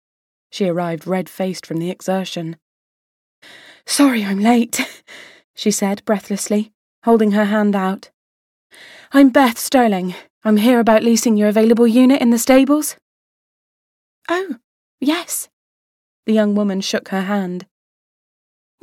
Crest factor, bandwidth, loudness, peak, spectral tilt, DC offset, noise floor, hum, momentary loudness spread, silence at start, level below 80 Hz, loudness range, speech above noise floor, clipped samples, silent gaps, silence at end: 16 dB; 16.5 kHz; -16 LUFS; -2 dBFS; -5 dB/octave; under 0.1%; under -90 dBFS; none; 14 LU; 0.55 s; -58 dBFS; 10 LU; over 74 dB; under 0.1%; 2.62-3.42 s, 5.44-5.54 s, 6.75-7.02 s, 8.14-8.70 s, 10.30-10.41 s, 13.02-14.22 s, 14.64-14.98 s, 15.53-16.23 s; 1.2 s